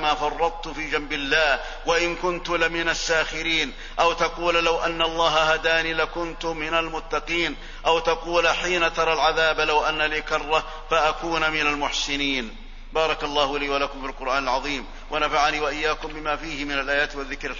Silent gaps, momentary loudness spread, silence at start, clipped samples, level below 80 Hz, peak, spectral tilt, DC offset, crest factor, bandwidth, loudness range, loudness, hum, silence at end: none; 8 LU; 0 s; under 0.1%; -38 dBFS; -6 dBFS; -2.5 dB/octave; under 0.1%; 18 dB; 7.4 kHz; 3 LU; -23 LUFS; none; 0 s